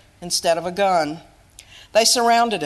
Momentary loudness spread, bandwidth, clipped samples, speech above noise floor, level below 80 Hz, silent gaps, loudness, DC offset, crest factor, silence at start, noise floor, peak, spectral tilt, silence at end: 9 LU; 13 kHz; under 0.1%; 28 dB; -56 dBFS; none; -18 LUFS; under 0.1%; 18 dB; 0.2 s; -46 dBFS; -2 dBFS; -2 dB/octave; 0 s